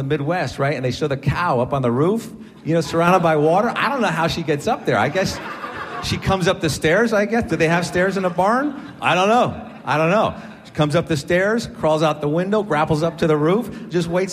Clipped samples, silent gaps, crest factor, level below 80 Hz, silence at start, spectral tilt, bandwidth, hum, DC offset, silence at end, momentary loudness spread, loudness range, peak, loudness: under 0.1%; none; 16 dB; -46 dBFS; 0 s; -6 dB/octave; 15 kHz; none; under 0.1%; 0 s; 8 LU; 2 LU; -2 dBFS; -19 LUFS